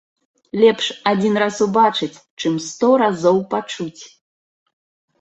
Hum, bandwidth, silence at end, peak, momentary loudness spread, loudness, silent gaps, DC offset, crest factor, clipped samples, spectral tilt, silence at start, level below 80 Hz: none; 8.2 kHz; 1.15 s; -2 dBFS; 13 LU; -18 LUFS; 2.30-2.37 s; under 0.1%; 18 dB; under 0.1%; -5 dB/octave; 0.55 s; -64 dBFS